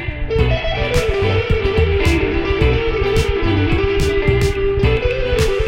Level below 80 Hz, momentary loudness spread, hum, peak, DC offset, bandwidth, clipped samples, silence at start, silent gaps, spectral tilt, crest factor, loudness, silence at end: -20 dBFS; 2 LU; none; -2 dBFS; under 0.1%; 16.5 kHz; under 0.1%; 0 s; none; -6 dB/octave; 14 dB; -17 LUFS; 0 s